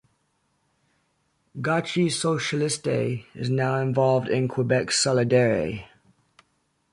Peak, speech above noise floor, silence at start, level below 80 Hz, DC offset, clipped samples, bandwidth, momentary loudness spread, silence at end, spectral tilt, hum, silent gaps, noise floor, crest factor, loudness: -8 dBFS; 48 dB; 1.55 s; -58 dBFS; under 0.1%; under 0.1%; 11.5 kHz; 10 LU; 1.05 s; -5 dB/octave; none; none; -71 dBFS; 18 dB; -24 LUFS